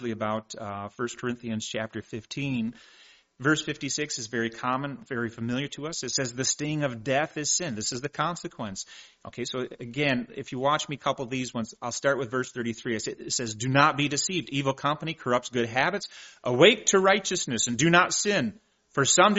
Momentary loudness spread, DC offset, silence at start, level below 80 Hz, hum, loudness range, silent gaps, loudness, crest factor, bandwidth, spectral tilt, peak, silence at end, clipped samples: 14 LU; under 0.1%; 0 s; -64 dBFS; none; 8 LU; none; -27 LUFS; 22 dB; 8 kHz; -3 dB/octave; -4 dBFS; 0 s; under 0.1%